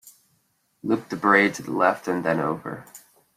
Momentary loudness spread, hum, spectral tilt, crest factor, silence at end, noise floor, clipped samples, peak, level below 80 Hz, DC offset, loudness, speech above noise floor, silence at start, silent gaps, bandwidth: 17 LU; none; -5.5 dB/octave; 22 dB; 0.4 s; -69 dBFS; under 0.1%; -4 dBFS; -68 dBFS; under 0.1%; -22 LUFS; 46 dB; 0.05 s; none; 15.5 kHz